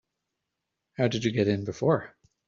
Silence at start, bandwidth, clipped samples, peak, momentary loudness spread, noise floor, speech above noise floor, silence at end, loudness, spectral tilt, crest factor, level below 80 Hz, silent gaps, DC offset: 1 s; 7.6 kHz; under 0.1%; -8 dBFS; 13 LU; -84 dBFS; 58 dB; 0.4 s; -27 LUFS; -6.5 dB/octave; 20 dB; -62 dBFS; none; under 0.1%